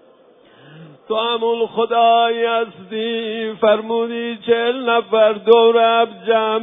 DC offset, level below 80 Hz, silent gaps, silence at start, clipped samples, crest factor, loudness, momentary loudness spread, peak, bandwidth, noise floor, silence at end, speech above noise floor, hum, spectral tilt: under 0.1%; -70 dBFS; none; 0.75 s; under 0.1%; 16 dB; -17 LUFS; 11 LU; 0 dBFS; 3.9 kHz; -49 dBFS; 0 s; 33 dB; none; -7 dB/octave